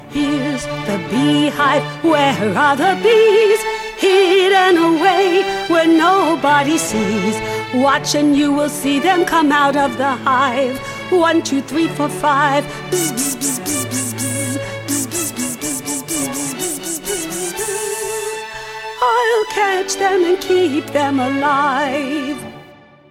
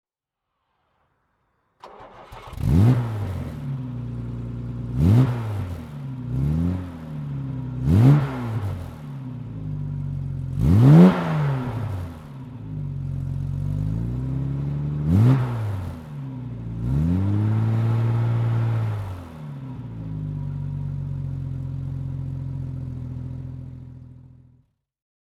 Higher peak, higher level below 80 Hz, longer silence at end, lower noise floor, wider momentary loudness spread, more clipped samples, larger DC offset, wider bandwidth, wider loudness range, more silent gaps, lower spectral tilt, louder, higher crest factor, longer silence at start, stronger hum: about the same, -2 dBFS vs -2 dBFS; second, -50 dBFS vs -38 dBFS; second, 0.4 s vs 1.05 s; second, -42 dBFS vs -84 dBFS; second, 10 LU vs 17 LU; neither; neither; first, 17 kHz vs 12.5 kHz; second, 7 LU vs 11 LU; neither; second, -3.5 dB/octave vs -9.5 dB/octave; first, -16 LUFS vs -23 LUFS; second, 14 dB vs 22 dB; second, 0 s vs 1.85 s; neither